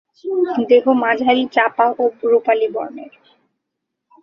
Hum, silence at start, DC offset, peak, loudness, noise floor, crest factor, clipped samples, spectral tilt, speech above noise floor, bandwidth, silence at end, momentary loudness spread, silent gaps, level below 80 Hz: none; 0.25 s; under 0.1%; -2 dBFS; -16 LUFS; -78 dBFS; 16 dB; under 0.1%; -6 dB/octave; 62 dB; 6 kHz; 1.15 s; 11 LU; none; -66 dBFS